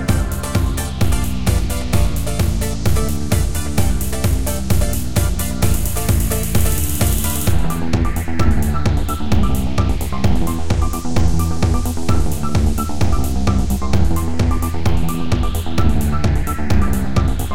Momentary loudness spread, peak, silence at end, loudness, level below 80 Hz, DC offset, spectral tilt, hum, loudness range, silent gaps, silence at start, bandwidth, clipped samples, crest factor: 2 LU; -2 dBFS; 0 s; -19 LUFS; -22 dBFS; 10%; -5.5 dB/octave; none; 1 LU; none; 0 s; 17 kHz; under 0.1%; 14 dB